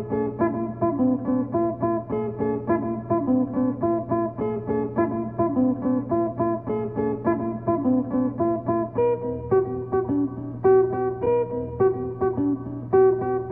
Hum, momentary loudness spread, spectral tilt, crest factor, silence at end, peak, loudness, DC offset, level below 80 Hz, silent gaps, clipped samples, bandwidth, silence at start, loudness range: none; 6 LU; -10.5 dB/octave; 16 dB; 0 s; -8 dBFS; -24 LUFS; under 0.1%; -50 dBFS; none; under 0.1%; 3 kHz; 0 s; 2 LU